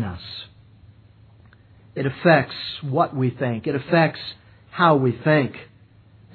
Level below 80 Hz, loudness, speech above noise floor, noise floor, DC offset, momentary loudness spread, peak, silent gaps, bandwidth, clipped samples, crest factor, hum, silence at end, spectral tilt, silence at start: -58 dBFS; -21 LUFS; 30 dB; -51 dBFS; under 0.1%; 18 LU; -4 dBFS; none; 4.6 kHz; under 0.1%; 20 dB; none; 0.7 s; -10 dB/octave; 0 s